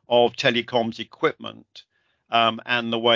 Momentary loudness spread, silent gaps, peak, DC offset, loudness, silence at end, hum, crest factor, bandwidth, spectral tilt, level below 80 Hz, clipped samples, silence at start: 9 LU; none; -4 dBFS; under 0.1%; -22 LUFS; 0 s; none; 20 dB; 7.6 kHz; -4.5 dB/octave; -68 dBFS; under 0.1%; 0.1 s